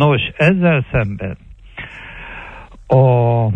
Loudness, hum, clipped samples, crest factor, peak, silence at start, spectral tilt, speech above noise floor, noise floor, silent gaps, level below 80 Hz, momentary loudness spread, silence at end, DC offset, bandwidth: -15 LUFS; none; under 0.1%; 14 dB; -2 dBFS; 0 s; -9 dB/octave; 22 dB; -35 dBFS; none; -38 dBFS; 20 LU; 0 s; under 0.1%; 5 kHz